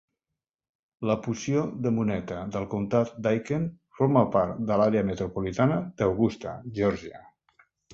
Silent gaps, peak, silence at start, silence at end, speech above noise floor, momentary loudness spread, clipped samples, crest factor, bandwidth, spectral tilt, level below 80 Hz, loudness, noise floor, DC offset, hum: none; -6 dBFS; 1 s; 0 s; 62 dB; 10 LU; under 0.1%; 22 dB; 7.6 kHz; -7.5 dB/octave; -54 dBFS; -27 LUFS; -88 dBFS; under 0.1%; none